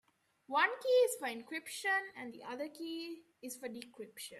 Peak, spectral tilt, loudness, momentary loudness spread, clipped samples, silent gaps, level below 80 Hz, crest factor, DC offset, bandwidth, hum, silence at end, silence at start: -18 dBFS; -1.5 dB/octave; -36 LUFS; 17 LU; under 0.1%; none; -88 dBFS; 20 dB; under 0.1%; 14.5 kHz; none; 0 s; 0.5 s